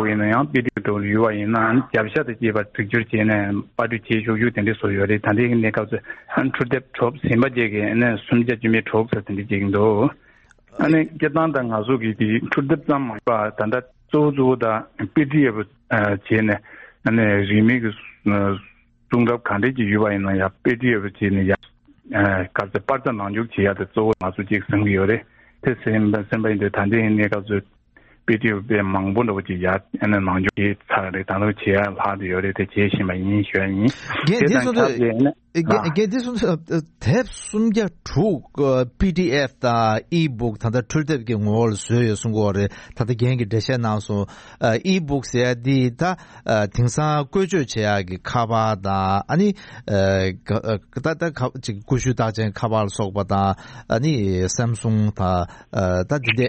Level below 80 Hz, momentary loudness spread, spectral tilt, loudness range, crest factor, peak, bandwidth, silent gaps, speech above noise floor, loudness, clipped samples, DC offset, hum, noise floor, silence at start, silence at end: -48 dBFS; 6 LU; -6.5 dB/octave; 2 LU; 18 dB; -2 dBFS; 8.4 kHz; none; 34 dB; -21 LUFS; under 0.1%; under 0.1%; none; -54 dBFS; 0 s; 0 s